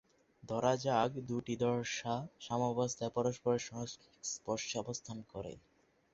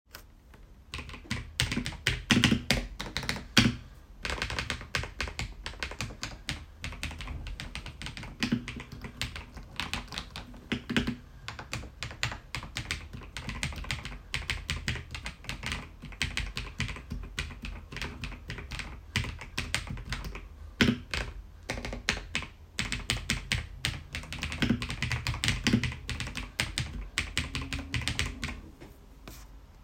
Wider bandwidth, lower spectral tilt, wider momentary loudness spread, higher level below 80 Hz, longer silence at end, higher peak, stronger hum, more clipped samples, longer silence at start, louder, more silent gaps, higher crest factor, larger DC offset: second, 8 kHz vs 16 kHz; first, -5 dB/octave vs -3.5 dB/octave; about the same, 12 LU vs 14 LU; second, -68 dBFS vs -44 dBFS; first, 0.55 s vs 0 s; second, -16 dBFS vs -4 dBFS; neither; neither; first, 0.45 s vs 0.1 s; second, -37 LUFS vs -33 LUFS; neither; second, 22 dB vs 32 dB; neither